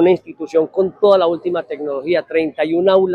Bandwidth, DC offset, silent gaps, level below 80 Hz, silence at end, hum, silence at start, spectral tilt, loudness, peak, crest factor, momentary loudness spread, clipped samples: 7 kHz; under 0.1%; none; -62 dBFS; 0 s; none; 0 s; -7.5 dB/octave; -17 LUFS; 0 dBFS; 16 dB; 9 LU; under 0.1%